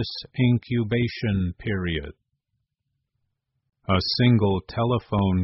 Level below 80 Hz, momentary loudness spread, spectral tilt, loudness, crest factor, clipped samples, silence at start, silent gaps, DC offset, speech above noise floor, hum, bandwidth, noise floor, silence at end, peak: -46 dBFS; 10 LU; -5.5 dB/octave; -24 LUFS; 16 dB; under 0.1%; 0 s; none; under 0.1%; 56 dB; none; 6 kHz; -79 dBFS; 0 s; -8 dBFS